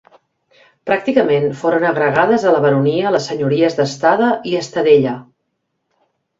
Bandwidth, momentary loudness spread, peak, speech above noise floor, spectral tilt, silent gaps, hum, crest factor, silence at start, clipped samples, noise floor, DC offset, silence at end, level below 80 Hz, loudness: 7.8 kHz; 7 LU; 0 dBFS; 57 dB; -6 dB/octave; none; none; 16 dB; 0.85 s; under 0.1%; -71 dBFS; under 0.1%; 1.15 s; -58 dBFS; -15 LUFS